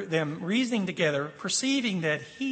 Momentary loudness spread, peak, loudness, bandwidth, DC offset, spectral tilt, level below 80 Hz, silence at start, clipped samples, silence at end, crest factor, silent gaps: 4 LU; -12 dBFS; -28 LUFS; 8.8 kHz; under 0.1%; -4 dB/octave; -74 dBFS; 0 s; under 0.1%; 0 s; 16 dB; none